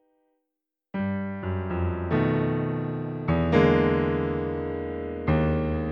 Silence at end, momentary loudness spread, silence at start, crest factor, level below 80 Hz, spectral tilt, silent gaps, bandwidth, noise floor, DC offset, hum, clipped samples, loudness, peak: 0 s; 10 LU; 0.95 s; 18 dB; -40 dBFS; -9.5 dB/octave; none; 6 kHz; -85 dBFS; under 0.1%; none; under 0.1%; -26 LUFS; -6 dBFS